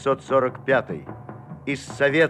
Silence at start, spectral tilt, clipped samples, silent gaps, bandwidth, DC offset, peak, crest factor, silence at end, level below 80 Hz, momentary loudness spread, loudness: 0 s; -5.5 dB/octave; under 0.1%; none; 11.5 kHz; under 0.1%; -6 dBFS; 18 dB; 0 s; -58 dBFS; 18 LU; -24 LUFS